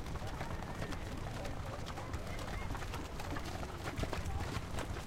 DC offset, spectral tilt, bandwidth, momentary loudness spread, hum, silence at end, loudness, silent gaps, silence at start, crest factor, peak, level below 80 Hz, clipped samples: under 0.1%; -5 dB/octave; 16.5 kHz; 3 LU; none; 0 s; -43 LUFS; none; 0 s; 20 dB; -22 dBFS; -46 dBFS; under 0.1%